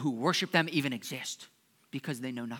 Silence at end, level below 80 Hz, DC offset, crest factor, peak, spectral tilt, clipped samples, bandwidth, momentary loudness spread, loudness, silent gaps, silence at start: 0 s; -88 dBFS; under 0.1%; 26 dB; -8 dBFS; -4 dB/octave; under 0.1%; 19 kHz; 13 LU; -32 LUFS; none; 0 s